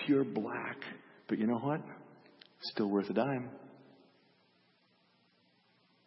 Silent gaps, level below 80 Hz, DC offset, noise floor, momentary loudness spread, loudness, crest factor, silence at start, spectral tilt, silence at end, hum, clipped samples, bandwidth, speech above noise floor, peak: none; -84 dBFS; under 0.1%; -71 dBFS; 21 LU; -36 LUFS; 20 dB; 0 s; -5.5 dB/octave; 2.25 s; none; under 0.1%; 5.6 kHz; 37 dB; -18 dBFS